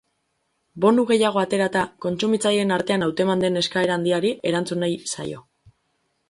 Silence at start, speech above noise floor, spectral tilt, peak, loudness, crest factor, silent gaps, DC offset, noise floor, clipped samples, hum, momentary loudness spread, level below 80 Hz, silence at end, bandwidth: 0.75 s; 51 dB; -5 dB/octave; -6 dBFS; -21 LUFS; 16 dB; none; under 0.1%; -72 dBFS; under 0.1%; none; 8 LU; -62 dBFS; 0.9 s; 11.5 kHz